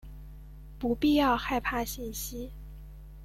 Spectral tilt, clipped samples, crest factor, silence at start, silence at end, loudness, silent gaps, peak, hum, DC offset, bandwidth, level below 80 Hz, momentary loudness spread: -4.5 dB/octave; under 0.1%; 16 dB; 0.05 s; 0 s; -29 LUFS; none; -14 dBFS; none; under 0.1%; 16.5 kHz; -44 dBFS; 24 LU